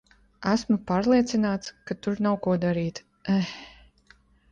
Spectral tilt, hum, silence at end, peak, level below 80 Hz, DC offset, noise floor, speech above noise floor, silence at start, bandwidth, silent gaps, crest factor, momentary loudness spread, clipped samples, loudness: -6.5 dB/octave; none; 0.8 s; -10 dBFS; -56 dBFS; under 0.1%; -59 dBFS; 34 dB; 0.4 s; 9 kHz; none; 18 dB; 12 LU; under 0.1%; -26 LUFS